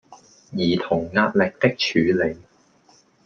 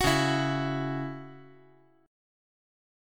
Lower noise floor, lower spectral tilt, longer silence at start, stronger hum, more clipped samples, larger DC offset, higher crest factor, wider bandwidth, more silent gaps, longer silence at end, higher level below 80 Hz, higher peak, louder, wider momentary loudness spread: about the same, -57 dBFS vs -60 dBFS; about the same, -6 dB/octave vs -5 dB/octave; about the same, 0.1 s vs 0 s; neither; neither; neither; about the same, 20 dB vs 22 dB; second, 7 kHz vs 17 kHz; neither; second, 0.85 s vs 1.55 s; about the same, -56 dBFS vs -52 dBFS; first, -4 dBFS vs -10 dBFS; first, -21 LUFS vs -29 LUFS; second, 7 LU vs 18 LU